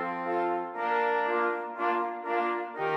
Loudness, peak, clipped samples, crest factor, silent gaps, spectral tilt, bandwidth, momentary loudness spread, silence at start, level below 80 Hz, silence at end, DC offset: -29 LUFS; -16 dBFS; under 0.1%; 14 dB; none; -6.5 dB/octave; 6.4 kHz; 4 LU; 0 s; -86 dBFS; 0 s; under 0.1%